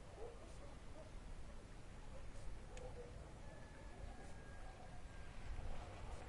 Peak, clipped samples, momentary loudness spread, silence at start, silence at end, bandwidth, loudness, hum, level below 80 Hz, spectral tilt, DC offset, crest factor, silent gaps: -36 dBFS; under 0.1%; 4 LU; 0 s; 0 s; 11 kHz; -57 LUFS; none; -54 dBFS; -5.5 dB/octave; under 0.1%; 16 dB; none